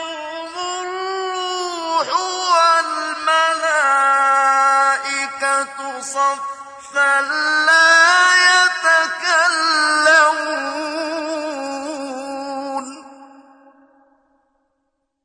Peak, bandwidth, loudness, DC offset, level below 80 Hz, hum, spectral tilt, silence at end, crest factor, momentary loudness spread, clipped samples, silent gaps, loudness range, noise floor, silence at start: -2 dBFS; 10.5 kHz; -15 LUFS; under 0.1%; -70 dBFS; none; 1 dB/octave; 2 s; 16 dB; 16 LU; under 0.1%; none; 14 LU; -72 dBFS; 0 s